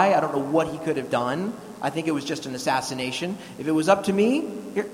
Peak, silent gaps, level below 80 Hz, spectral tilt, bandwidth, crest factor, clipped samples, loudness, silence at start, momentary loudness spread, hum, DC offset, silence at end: -4 dBFS; none; -62 dBFS; -5 dB/octave; 16 kHz; 20 dB; under 0.1%; -25 LUFS; 0 s; 9 LU; none; under 0.1%; 0 s